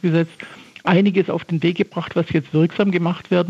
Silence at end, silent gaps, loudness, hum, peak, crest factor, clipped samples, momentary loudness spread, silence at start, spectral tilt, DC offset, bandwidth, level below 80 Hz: 0 s; none; -19 LUFS; none; -4 dBFS; 16 dB; under 0.1%; 10 LU; 0.05 s; -8.5 dB/octave; under 0.1%; 7.6 kHz; -60 dBFS